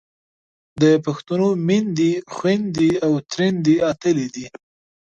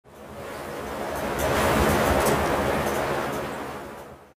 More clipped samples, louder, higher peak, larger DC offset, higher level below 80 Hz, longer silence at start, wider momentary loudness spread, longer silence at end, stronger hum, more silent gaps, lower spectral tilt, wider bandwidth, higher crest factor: neither; first, -19 LUFS vs -25 LUFS; first, -4 dBFS vs -10 dBFS; neither; second, -58 dBFS vs -38 dBFS; first, 0.75 s vs 0.05 s; second, 6 LU vs 17 LU; first, 0.6 s vs 0.1 s; neither; neither; first, -6.5 dB/octave vs -4.5 dB/octave; second, 8 kHz vs 16 kHz; about the same, 16 dB vs 16 dB